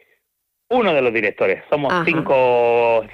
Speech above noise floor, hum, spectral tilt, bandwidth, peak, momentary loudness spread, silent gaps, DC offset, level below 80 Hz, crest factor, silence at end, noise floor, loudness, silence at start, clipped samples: 57 dB; none; -7 dB/octave; 6.4 kHz; -4 dBFS; 5 LU; none; under 0.1%; -56 dBFS; 14 dB; 0 s; -74 dBFS; -17 LUFS; 0.7 s; under 0.1%